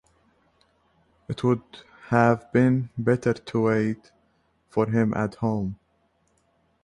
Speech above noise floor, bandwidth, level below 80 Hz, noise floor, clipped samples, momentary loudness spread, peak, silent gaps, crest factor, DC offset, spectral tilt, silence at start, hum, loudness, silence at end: 44 dB; 10.5 kHz; -56 dBFS; -68 dBFS; under 0.1%; 12 LU; -6 dBFS; none; 20 dB; under 0.1%; -8.5 dB/octave; 1.3 s; none; -24 LUFS; 1.1 s